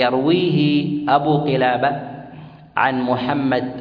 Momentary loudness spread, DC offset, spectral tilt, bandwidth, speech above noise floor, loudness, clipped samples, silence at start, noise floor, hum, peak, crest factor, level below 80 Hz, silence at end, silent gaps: 12 LU; under 0.1%; -9 dB/octave; 5.2 kHz; 21 dB; -18 LUFS; under 0.1%; 0 s; -39 dBFS; none; -2 dBFS; 16 dB; -56 dBFS; 0 s; none